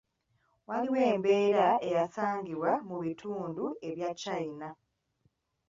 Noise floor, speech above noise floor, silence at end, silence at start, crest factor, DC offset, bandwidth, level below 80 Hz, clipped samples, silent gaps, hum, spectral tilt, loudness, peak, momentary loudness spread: -75 dBFS; 44 dB; 0.95 s; 0.7 s; 18 dB; under 0.1%; 7.6 kHz; -74 dBFS; under 0.1%; none; none; -6 dB/octave; -31 LUFS; -14 dBFS; 12 LU